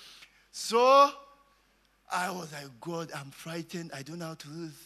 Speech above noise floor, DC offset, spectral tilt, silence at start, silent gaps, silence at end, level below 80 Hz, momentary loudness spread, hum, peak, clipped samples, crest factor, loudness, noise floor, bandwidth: 39 dB; under 0.1%; -4 dB/octave; 0 s; none; 0.1 s; -74 dBFS; 21 LU; none; -10 dBFS; under 0.1%; 22 dB; -28 LUFS; -68 dBFS; 13.5 kHz